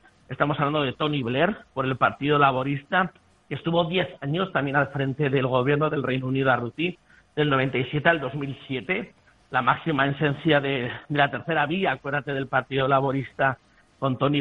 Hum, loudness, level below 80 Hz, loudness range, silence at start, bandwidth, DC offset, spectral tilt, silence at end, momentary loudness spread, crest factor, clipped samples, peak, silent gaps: none; -24 LUFS; -58 dBFS; 1 LU; 0.3 s; 4.8 kHz; under 0.1%; -8.5 dB/octave; 0 s; 7 LU; 22 dB; under 0.1%; -4 dBFS; none